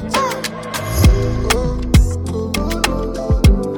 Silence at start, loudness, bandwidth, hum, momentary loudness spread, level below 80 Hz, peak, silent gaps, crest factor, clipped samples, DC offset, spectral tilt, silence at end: 0 s; -17 LUFS; 19 kHz; none; 8 LU; -18 dBFS; 0 dBFS; none; 16 dB; under 0.1%; under 0.1%; -5.5 dB/octave; 0 s